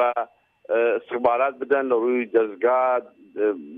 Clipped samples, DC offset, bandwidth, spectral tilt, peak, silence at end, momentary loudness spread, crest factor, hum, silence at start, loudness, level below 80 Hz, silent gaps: under 0.1%; under 0.1%; 3.8 kHz; -8 dB/octave; -6 dBFS; 0 s; 6 LU; 16 dB; none; 0 s; -22 LUFS; -70 dBFS; none